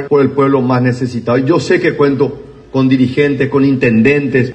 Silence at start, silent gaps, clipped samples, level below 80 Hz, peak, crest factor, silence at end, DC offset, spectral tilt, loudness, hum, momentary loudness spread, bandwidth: 0 s; none; under 0.1%; -46 dBFS; 0 dBFS; 12 dB; 0 s; under 0.1%; -7.5 dB/octave; -12 LUFS; none; 6 LU; 8.6 kHz